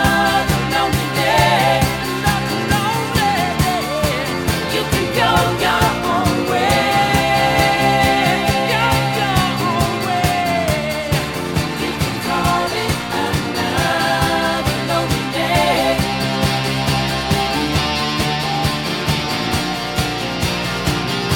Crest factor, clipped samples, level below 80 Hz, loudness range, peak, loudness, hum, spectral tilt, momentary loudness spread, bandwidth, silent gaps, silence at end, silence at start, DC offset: 16 dB; under 0.1%; -34 dBFS; 4 LU; 0 dBFS; -17 LUFS; none; -4.5 dB/octave; 5 LU; 18.5 kHz; none; 0 s; 0 s; 0.2%